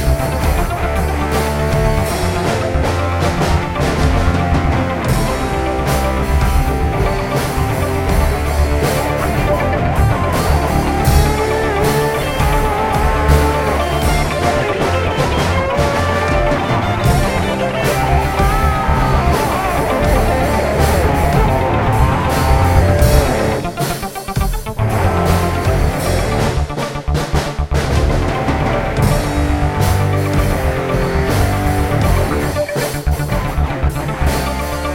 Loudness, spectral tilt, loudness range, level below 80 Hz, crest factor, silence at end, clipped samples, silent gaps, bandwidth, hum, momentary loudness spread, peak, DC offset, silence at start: -16 LUFS; -6 dB/octave; 3 LU; -20 dBFS; 14 dB; 0 s; under 0.1%; none; 16.5 kHz; none; 4 LU; 0 dBFS; under 0.1%; 0 s